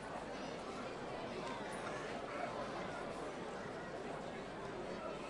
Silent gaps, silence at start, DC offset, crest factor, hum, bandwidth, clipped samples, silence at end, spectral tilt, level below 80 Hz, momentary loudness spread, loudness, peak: none; 0 s; under 0.1%; 14 dB; none; 11.5 kHz; under 0.1%; 0 s; -5 dB/octave; -66 dBFS; 3 LU; -45 LUFS; -30 dBFS